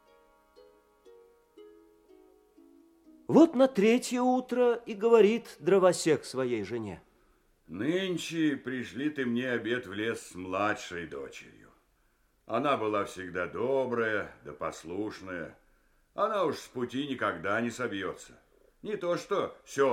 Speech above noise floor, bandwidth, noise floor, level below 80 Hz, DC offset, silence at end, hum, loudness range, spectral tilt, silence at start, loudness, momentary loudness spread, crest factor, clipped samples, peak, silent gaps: 40 dB; 16 kHz; -70 dBFS; -68 dBFS; under 0.1%; 0 s; none; 8 LU; -5 dB/octave; 1.05 s; -30 LUFS; 16 LU; 22 dB; under 0.1%; -8 dBFS; none